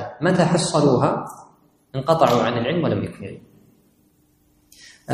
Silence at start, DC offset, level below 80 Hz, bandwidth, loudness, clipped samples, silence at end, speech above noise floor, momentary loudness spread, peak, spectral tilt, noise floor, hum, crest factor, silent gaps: 0 s; under 0.1%; -56 dBFS; 15 kHz; -20 LUFS; under 0.1%; 0 s; 41 dB; 20 LU; 0 dBFS; -6 dB/octave; -60 dBFS; none; 22 dB; none